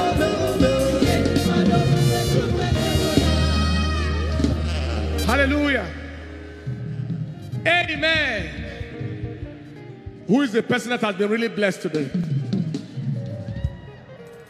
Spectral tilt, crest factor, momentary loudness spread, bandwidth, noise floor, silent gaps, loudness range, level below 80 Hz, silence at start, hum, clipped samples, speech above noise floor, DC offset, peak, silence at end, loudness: -5.5 dB/octave; 20 dB; 16 LU; 15 kHz; -41 dBFS; none; 5 LU; -34 dBFS; 0 s; none; under 0.1%; 20 dB; under 0.1%; -2 dBFS; 0.05 s; -22 LUFS